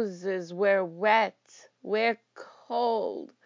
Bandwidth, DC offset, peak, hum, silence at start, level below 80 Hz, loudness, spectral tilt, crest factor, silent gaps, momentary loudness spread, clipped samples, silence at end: 7.6 kHz; under 0.1%; -10 dBFS; none; 0 s; under -90 dBFS; -28 LUFS; -5 dB/octave; 20 dB; none; 11 LU; under 0.1%; 0.2 s